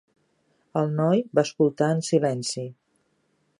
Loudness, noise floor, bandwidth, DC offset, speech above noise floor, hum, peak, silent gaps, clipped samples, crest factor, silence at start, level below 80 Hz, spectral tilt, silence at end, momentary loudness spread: -24 LUFS; -70 dBFS; 11.5 kHz; under 0.1%; 46 dB; none; -6 dBFS; none; under 0.1%; 20 dB; 0.75 s; -74 dBFS; -6 dB/octave; 0.85 s; 9 LU